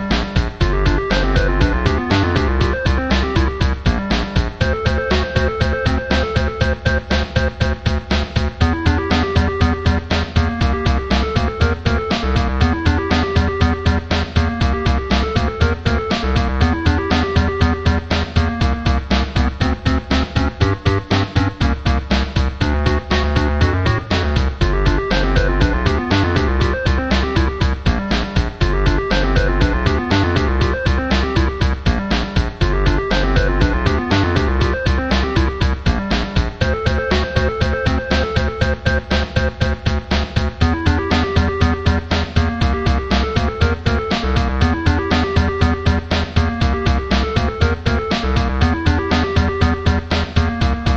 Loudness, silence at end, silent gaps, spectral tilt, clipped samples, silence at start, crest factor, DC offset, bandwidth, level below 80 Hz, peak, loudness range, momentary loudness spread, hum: -18 LUFS; 0 s; none; -6.5 dB/octave; under 0.1%; 0 s; 16 dB; under 0.1%; 7.6 kHz; -20 dBFS; 0 dBFS; 1 LU; 3 LU; none